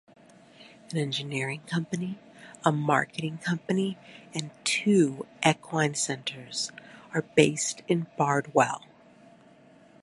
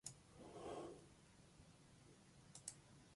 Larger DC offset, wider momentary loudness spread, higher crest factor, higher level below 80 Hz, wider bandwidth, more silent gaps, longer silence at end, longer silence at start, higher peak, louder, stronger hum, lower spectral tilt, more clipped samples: neither; about the same, 13 LU vs 14 LU; about the same, 24 dB vs 28 dB; about the same, -72 dBFS vs -76 dBFS; about the same, 11.5 kHz vs 11.5 kHz; neither; first, 1.25 s vs 0 s; first, 0.6 s vs 0.05 s; first, -4 dBFS vs -32 dBFS; first, -28 LUFS vs -59 LUFS; neither; about the same, -4.5 dB/octave vs -3.5 dB/octave; neither